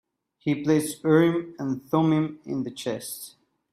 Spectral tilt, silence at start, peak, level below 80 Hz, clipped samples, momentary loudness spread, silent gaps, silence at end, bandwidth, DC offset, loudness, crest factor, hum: -6 dB/octave; 0.45 s; -6 dBFS; -66 dBFS; under 0.1%; 13 LU; none; 0.45 s; 15.5 kHz; under 0.1%; -25 LUFS; 18 dB; none